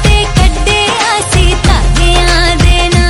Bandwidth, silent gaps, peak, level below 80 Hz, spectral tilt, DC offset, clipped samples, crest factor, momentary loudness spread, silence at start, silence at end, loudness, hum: 12 kHz; none; 0 dBFS; -10 dBFS; -4 dB/octave; under 0.1%; 2%; 8 dB; 2 LU; 0 s; 0 s; -9 LUFS; none